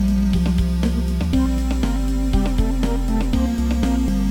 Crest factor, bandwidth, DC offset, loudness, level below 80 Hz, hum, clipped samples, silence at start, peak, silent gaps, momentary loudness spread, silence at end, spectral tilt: 12 dB; 17 kHz; under 0.1%; -21 LUFS; -20 dBFS; none; under 0.1%; 0 s; -6 dBFS; none; 3 LU; 0 s; -7 dB/octave